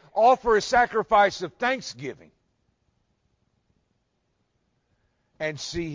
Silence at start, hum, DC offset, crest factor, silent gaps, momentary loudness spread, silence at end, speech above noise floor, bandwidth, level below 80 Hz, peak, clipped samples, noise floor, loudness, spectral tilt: 0.15 s; none; under 0.1%; 18 dB; none; 14 LU; 0 s; 50 dB; 7.6 kHz; -54 dBFS; -8 dBFS; under 0.1%; -73 dBFS; -23 LUFS; -4 dB/octave